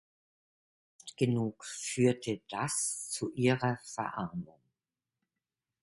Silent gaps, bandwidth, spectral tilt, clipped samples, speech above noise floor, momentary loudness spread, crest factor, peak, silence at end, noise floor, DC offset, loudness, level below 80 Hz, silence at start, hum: none; 12 kHz; -5 dB/octave; under 0.1%; over 57 dB; 12 LU; 22 dB; -14 dBFS; 1.4 s; under -90 dBFS; under 0.1%; -33 LUFS; -70 dBFS; 1.05 s; none